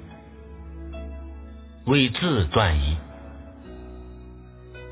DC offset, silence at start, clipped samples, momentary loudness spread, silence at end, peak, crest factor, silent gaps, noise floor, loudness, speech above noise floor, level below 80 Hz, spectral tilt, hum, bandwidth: under 0.1%; 0 s; under 0.1%; 24 LU; 0 s; -4 dBFS; 22 dB; none; -43 dBFS; -22 LUFS; 22 dB; -34 dBFS; -10.5 dB/octave; none; 4 kHz